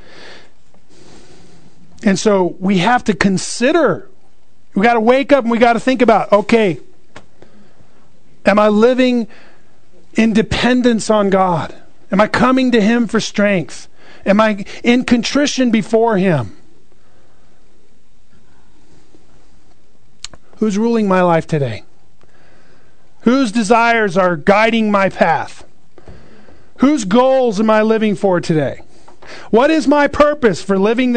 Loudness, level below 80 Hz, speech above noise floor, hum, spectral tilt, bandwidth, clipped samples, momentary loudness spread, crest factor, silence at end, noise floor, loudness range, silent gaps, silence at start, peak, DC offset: -14 LUFS; -44 dBFS; 42 dB; none; -5.5 dB/octave; 9.4 kHz; under 0.1%; 9 LU; 16 dB; 0 s; -55 dBFS; 5 LU; none; 0.2 s; 0 dBFS; 3%